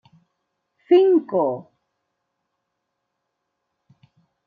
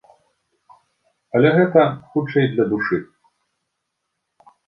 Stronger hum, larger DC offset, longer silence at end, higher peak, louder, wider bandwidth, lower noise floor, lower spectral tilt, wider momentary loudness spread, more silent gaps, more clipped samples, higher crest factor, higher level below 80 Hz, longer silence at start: neither; neither; first, 2.85 s vs 1.65 s; second, -6 dBFS vs -2 dBFS; about the same, -18 LUFS vs -18 LUFS; second, 4.9 kHz vs 5.6 kHz; about the same, -78 dBFS vs -77 dBFS; about the same, -9 dB/octave vs -9.5 dB/octave; about the same, 11 LU vs 9 LU; neither; neither; about the same, 20 dB vs 20 dB; second, -82 dBFS vs -62 dBFS; second, 0.9 s vs 1.35 s